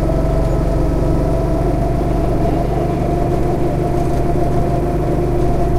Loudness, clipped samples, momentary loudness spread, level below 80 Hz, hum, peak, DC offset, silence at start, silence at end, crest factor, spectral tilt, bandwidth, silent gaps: -17 LUFS; under 0.1%; 1 LU; -20 dBFS; none; -2 dBFS; under 0.1%; 0 s; 0 s; 14 dB; -8.5 dB/octave; 14 kHz; none